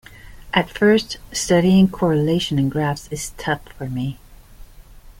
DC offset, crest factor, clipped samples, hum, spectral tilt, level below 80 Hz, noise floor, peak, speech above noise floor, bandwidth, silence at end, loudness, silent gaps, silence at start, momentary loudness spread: under 0.1%; 18 dB; under 0.1%; none; -5.5 dB/octave; -42 dBFS; -42 dBFS; -2 dBFS; 24 dB; 16.5 kHz; 0.1 s; -19 LUFS; none; 0.25 s; 12 LU